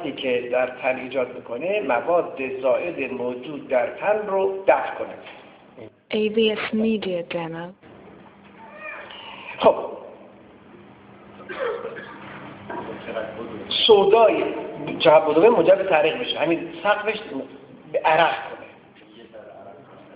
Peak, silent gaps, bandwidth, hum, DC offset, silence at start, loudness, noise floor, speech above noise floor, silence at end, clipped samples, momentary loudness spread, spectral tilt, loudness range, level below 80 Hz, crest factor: -2 dBFS; none; 4 kHz; none; under 0.1%; 0 s; -21 LUFS; -48 dBFS; 27 dB; 0 s; under 0.1%; 21 LU; -8.5 dB/octave; 10 LU; -62 dBFS; 22 dB